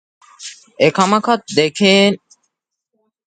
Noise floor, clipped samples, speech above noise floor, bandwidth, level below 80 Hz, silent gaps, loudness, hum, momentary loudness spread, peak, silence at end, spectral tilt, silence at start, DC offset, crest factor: -74 dBFS; under 0.1%; 60 dB; 9.4 kHz; -62 dBFS; none; -14 LUFS; none; 22 LU; 0 dBFS; 1.1 s; -4.5 dB/octave; 0.4 s; under 0.1%; 18 dB